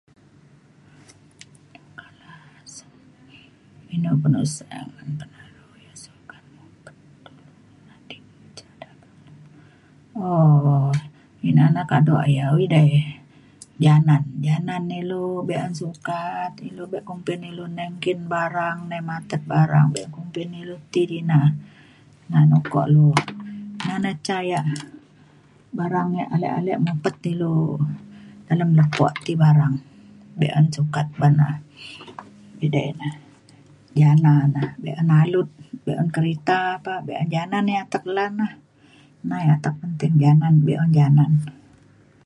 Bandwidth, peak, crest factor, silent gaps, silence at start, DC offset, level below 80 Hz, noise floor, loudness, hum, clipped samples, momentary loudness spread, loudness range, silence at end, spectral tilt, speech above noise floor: 11 kHz; -2 dBFS; 20 dB; none; 2.3 s; under 0.1%; -60 dBFS; -53 dBFS; -21 LUFS; none; under 0.1%; 17 LU; 8 LU; 0.75 s; -7.5 dB/octave; 34 dB